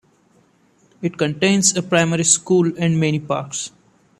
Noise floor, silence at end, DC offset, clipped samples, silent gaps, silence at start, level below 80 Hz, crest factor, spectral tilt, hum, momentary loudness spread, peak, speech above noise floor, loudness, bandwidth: -57 dBFS; 0.5 s; under 0.1%; under 0.1%; none; 1 s; -60 dBFS; 18 dB; -4 dB/octave; none; 12 LU; -2 dBFS; 39 dB; -18 LUFS; 13.5 kHz